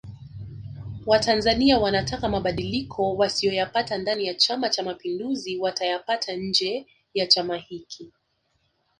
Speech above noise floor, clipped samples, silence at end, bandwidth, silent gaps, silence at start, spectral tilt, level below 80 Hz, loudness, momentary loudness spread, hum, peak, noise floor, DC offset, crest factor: 47 dB; under 0.1%; 0.9 s; 11 kHz; none; 0.05 s; -4 dB/octave; -48 dBFS; -24 LUFS; 19 LU; none; -2 dBFS; -71 dBFS; under 0.1%; 22 dB